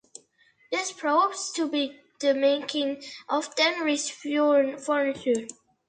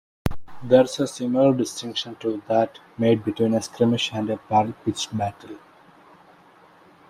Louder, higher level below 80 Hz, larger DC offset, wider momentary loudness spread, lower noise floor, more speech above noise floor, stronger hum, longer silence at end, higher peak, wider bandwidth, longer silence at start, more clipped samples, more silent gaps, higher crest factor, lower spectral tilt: second, -26 LUFS vs -23 LUFS; second, -74 dBFS vs -50 dBFS; neither; second, 8 LU vs 12 LU; first, -63 dBFS vs -52 dBFS; first, 37 dB vs 30 dB; neither; second, 0.35 s vs 1.55 s; second, -10 dBFS vs -4 dBFS; second, 9.6 kHz vs 15.5 kHz; first, 0.7 s vs 0.25 s; neither; neither; about the same, 16 dB vs 20 dB; second, -1.5 dB/octave vs -5.5 dB/octave